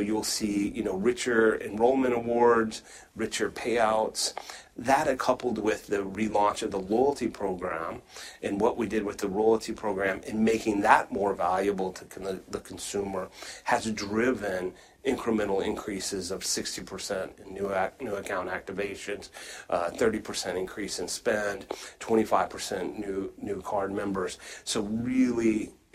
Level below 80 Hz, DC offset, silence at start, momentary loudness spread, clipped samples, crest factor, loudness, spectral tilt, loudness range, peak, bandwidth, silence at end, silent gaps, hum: -56 dBFS; under 0.1%; 0 s; 12 LU; under 0.1%; 22 dB; -29 LUFS; -4 dB/octave; 5 LU; -6 dBFS; 16 kHz; 0.2 s; none; none